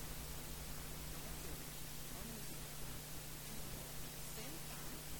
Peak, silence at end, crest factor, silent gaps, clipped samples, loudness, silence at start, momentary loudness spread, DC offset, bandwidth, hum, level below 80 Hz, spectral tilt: -34 dBFS; 0 s; 12 dB; none; under 0.1%; -48 LUFS; 0 s; 1 LU; 0.2%; 18 kHz; none; -56 dBFS; -3 dB/octave